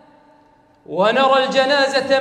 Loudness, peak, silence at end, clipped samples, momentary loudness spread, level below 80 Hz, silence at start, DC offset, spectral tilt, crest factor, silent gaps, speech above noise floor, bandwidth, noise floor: -16 LUFS; 0 dBFS; 0 s; under 0.1%; 4 LU; -66 dBFS; 0.9 s; under 0.1%; -3.5 dB/octave; 16 dB; none; 37 dB; 10.5 kHz; -53 dBFS